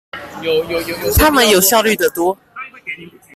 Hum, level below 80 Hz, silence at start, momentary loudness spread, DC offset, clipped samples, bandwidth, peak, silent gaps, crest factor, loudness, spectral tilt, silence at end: none; -30 dBFS; 0.15 s; 19 LU; under 0.1%; under 0.1%; 16 kHz; 0 dBFS; none; 16 dB; -13 LUFS; -3 dB/octave; 0.25 s